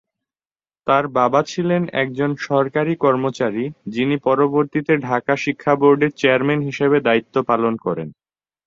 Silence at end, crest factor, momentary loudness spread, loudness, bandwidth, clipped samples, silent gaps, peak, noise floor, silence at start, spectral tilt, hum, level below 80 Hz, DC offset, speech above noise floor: 0.55 s; 16 dB; 7 LU; -18 LUFS; 7.6 kHz; under 0.1%; none; -2 dBFS; under -90 dBFS; 0.85 s; -6.5 dB/octave; none; -62 dBFS; under 0.1%; over 72 dB